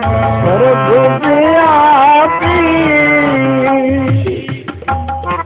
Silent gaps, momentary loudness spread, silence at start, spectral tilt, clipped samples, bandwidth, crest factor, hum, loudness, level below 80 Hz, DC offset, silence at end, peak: none; 11 LU; 0 s; -10 dB/octave; under 0.1%; 4 kHz; 10 dB; none; -10 LUFS; -30 dBFS; under 0.1%; 0 s; 0 dBFS